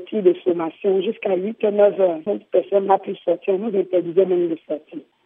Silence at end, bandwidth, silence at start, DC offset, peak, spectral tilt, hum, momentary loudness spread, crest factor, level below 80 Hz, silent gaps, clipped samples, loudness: 0.25 s; 3.7 kHz; 0 s; under 0.1%; -2 dBFS; -10.5 dB/octave; none; 8 LU; 18 dB; -82 dBFS; none; under 0.1%; -20 LUFS